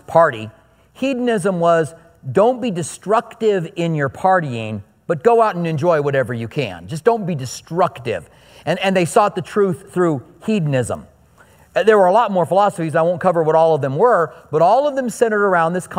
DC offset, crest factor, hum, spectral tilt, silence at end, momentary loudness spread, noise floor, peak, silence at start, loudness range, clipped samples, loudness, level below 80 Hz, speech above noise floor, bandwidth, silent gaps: under 0.1%; 16 dB; none; -6 dB/octave; 0 s; 11 LU; -49 dBFS; 0 dBFS; 0.1 s; 4 LU; under 0.1%; -17 LUFS; -58 dBFS; 33 dB; 16 kHz; none